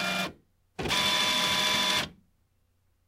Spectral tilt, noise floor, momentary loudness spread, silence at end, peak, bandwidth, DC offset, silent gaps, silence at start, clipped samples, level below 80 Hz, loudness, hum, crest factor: -1.5 dB/octave; -70 dBFS; 13 LU; 0.95 s; -14 dBFS; 16 kHz; under 0.1%; none; 0 s; under 0.1%; -56 dBFS; -25 LUFS; none; 16 dB